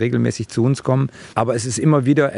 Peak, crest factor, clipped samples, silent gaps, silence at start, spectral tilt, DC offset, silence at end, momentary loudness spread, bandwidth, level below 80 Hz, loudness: 0 dBFS; 16 dB; under 0.1%; none; 0 s; -6.5 dB/octave; under 0.1%; 0 s; 6 LU; 11.5 kHz; -56 dBFS; -19 LUFS